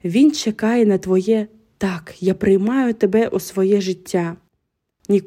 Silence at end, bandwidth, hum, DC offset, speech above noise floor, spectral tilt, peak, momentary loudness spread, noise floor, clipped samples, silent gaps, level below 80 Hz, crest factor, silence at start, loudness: 0.05 s; 15.5 kHz; none; under 0.1%; 56 dB; -6 dB/octave; -4 dBFS; 8 LU; -73 dBFS; under 0.1%; none; -54 dBFS; 14 dB; 0.05 s; -18 LUFS